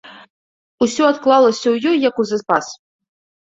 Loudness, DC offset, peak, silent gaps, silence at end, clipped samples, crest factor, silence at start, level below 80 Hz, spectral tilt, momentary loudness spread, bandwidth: -16 LUFS; under 0.1%; -2 dBFS; 0.30-0.78 s; 0.75 s; under 0.1%; 16 dB; 0.05 s; -62 dBFS; -4 dB/octave; 8 LU; 8 kHz